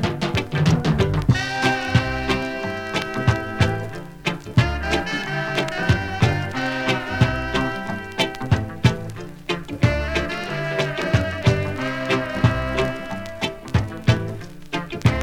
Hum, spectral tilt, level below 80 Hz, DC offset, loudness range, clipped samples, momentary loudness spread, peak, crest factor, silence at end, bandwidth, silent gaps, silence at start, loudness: none; -6 dB/octave; -36 dBFS; under 0.1%; 2 LU; under 0.1%; 8 LU; -2 dBFS; 20 dB; 0 s; 15.5 kHz; none; 0 s; -22 LUFS